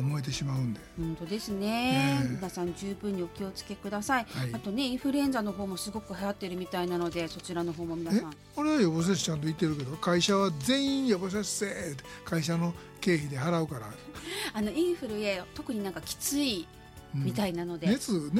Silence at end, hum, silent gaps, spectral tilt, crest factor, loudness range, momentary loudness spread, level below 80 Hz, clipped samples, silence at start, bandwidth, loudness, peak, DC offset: 0 s; none; none; -5 dB/octave; 16 dB; 4 LU; 10 LU; -56 dBFS; under 0.1%; 0 s; 16.5 kHz; -31 LUFS; -14 dBFS; under 0.1%